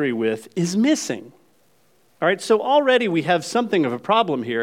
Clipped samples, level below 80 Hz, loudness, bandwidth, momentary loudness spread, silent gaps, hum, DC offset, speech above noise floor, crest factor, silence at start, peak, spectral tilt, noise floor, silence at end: under 0.1%; -76 dBFS; -20 LUFS; 16 kHz; 7 LU; none; none; under 0.1%; 41 dB; 16 dB; 0 s; -4 dBFS; -4.5 dB/octave; -61 dBFS; 0 s